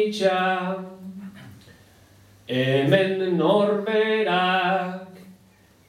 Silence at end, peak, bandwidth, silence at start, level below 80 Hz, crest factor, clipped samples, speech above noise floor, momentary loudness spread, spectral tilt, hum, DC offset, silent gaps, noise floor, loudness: 0.55 s; -4 dBFS; 15 kHz; 0 s; -70 dBFS; 20 dB; under 0.1%; 34 dB; 18 LU; -6 dB/octave; none; under 0.1%; none; -56 dBFS; -22 LUFS